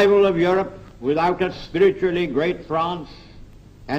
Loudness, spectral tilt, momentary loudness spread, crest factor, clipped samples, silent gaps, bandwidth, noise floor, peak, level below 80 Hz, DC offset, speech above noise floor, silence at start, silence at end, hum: -21 LUFS; -7 dB/octave; 12 LU; 16 dB; under 0.1%; none; 7.8 kHz; -43 dBFS; -6 dBFS; -46 dBFS; under 0.1%; 23 dB; 0 s; 0 s; none